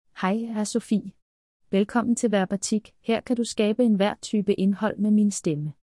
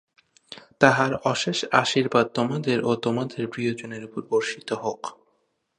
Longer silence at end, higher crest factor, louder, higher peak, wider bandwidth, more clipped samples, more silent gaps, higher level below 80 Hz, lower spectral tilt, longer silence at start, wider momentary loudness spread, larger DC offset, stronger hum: second, 0.1 s vs 0.65 s; second, 16 dB vs 24 dB; about the same, -24 LUFS vs -24 LUFS; second, -8 dBFS vs 0 dBFS; about the same, 12 kHz vs 11 kHz; neither; first, 1.22-1.60 s vs none; about the same, -64 dBFS vs -64 dBFS; about the same, -5.5 dB/octave vs -4.5 dB/octave; second, 0.15 s vs 0.5 s; second, 6 LU vs 15 LU; neither; neither